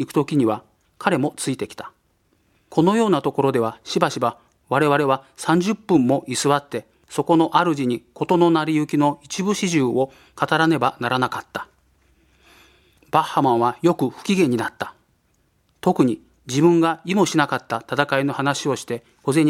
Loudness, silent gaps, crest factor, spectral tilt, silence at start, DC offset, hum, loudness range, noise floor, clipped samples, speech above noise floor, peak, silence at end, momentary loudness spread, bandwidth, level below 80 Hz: -20 LUFS; none; 20 dB; -5.5 dB/octave; 0 s; under 0.1%; none; 3 LU; -64 dBFS; under 0.1%; 44 dB; 0 dBFS; 0 s; 10 LU; 15 kHz; -62 dBFS